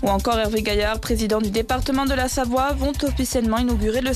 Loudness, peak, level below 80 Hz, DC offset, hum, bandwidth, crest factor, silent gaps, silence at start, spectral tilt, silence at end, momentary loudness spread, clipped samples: -21 LUFS; -10 dBFS; -30 dBFS; under 0.1%; none; 14 kHz; 12 dB; none; 0 s; -4.5 dB/octave; 0 s; 2 LU; under 0.1%